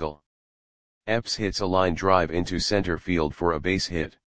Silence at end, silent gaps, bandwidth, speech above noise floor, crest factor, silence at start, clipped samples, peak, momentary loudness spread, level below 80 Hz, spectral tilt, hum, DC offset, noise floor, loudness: 0.1 s; 0.26-1.01 s; 10 kHz; over 66 dB; 20 dB; 0 s; under 0.1%; -4 dBFS; 7 LU; -44 dBFS; -5 dB/octave; none; 0.8%; under -90 dBFS; -25 LUFS